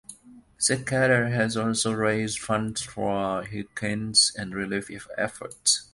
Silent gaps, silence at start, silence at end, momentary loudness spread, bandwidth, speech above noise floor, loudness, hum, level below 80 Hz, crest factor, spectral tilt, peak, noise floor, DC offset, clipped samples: none; 0.1 s; 0.1 s; 11 LU; 11.5 kHz; 25 dB; -25 LUFS; none; -56 dBFS; 20 dB; -3 dB/octave; -6 dBFS; -51 dBFS; under 0.1%; under 0.1%